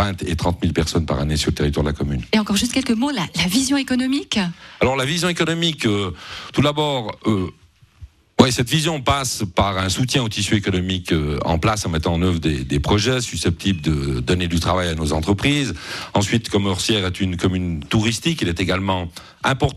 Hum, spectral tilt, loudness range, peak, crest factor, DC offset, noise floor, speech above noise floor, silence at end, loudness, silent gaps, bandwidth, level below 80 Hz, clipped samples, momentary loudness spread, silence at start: none; -5 dB/octave; 1 LU; 0 dBFS; 20 dB; under 0.1%; -44 dBFS; 24 dB; 0 s; -20 LUFS; none; 14.5 kHz; -34 dBFS; under 0.1%; 4 LU; 0 s